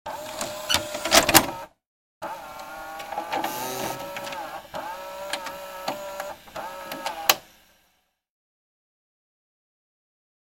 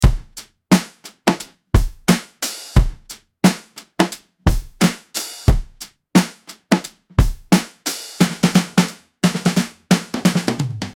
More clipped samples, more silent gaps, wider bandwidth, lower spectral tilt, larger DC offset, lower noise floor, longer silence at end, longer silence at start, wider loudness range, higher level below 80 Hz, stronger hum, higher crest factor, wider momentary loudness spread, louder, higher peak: neither; first, 1.87-2.21 s vs none; about the same, 17 kHz vs 17.5 kHz; second, -1.5 dB/octave vs -5 dB/octave; neither; first, -69 dBFS vs -41 dBFS; first, 3.1 s vs 0.05 s; about the same, 0.05 s vs 0 s; first, 10 LU vs 2 LU; second, -54 dBFS vs -26 dBFS; neither; first, 30 dB vs 18 dB; first, 19 LU vs 11 LU; second, -25 LUFS vs -19 LUFS; about the same, 0 dBFS vs -2 dBFS